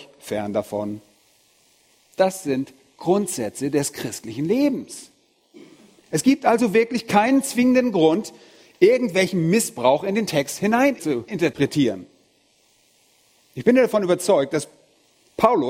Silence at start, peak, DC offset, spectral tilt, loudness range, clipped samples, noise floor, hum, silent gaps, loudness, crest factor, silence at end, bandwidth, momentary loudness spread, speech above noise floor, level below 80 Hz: 0 s; 0 dBFS; under 0.1%; -5 dB/octave; 6 LU; under 0.1%; -61 dBFS; none; none; -21 LUFS; 22 dB; 0 s; 16.5 kHz; 13 LU; 41 dB; -62 dBFS